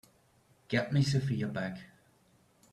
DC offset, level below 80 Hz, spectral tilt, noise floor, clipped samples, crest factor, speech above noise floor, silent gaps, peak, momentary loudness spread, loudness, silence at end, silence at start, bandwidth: under 0.1%; -64 dBFS; -6.5 dB/octave; -67 dBFS; under 0.1%; 20 dB; 36 dB; none; -14 dBFS; 11 LU; -32 LUFS; 0.9 s; 0.7 s; 12 kHz